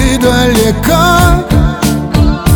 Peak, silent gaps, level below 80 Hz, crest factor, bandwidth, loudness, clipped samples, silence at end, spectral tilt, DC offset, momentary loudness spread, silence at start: 0 dBFS; none; -16 dBFS; 8 dB; over 20 kHz; -9 LUFS; 0.3%; 0 s; -5.5 dB/octave; under 0.1%; 4 LU; 0 s